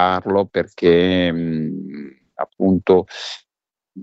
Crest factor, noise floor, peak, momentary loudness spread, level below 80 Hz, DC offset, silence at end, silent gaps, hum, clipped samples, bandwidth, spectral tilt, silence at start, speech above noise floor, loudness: 16 dB; -89 dBFS; -2 dBFS; 18 LU; -52 dBFS; under 0.1%; 0 s; none; none; under 0.1%; 8 kHz; -7 dB/octave; 0 s; 72 dB; -18 LUFS